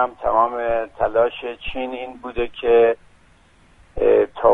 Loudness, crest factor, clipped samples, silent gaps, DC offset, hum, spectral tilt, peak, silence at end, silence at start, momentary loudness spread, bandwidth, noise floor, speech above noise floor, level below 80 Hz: -20 LUFS; 18 dB; under 0.1%; none; under 0.1%; none; -7 dB/octave; -2 dBFS; 0 s; 0 s; 14 LU; 3.9 kHz; -53 dBFS; 33 dB; -42 dBFS